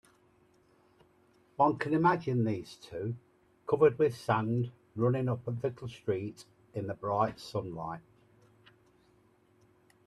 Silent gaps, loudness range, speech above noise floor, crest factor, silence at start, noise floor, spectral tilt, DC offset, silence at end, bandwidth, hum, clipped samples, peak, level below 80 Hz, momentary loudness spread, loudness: none; 8 LU; 35 dB; 20 dB; 1.6 s; -66 dBFS; -8 dB/octave; under 0.1%; 2.05 s; 12.5 kHz; none; under 0.1%; -12 dBFS; -68 dBFS; 16 LU; -32 LUFS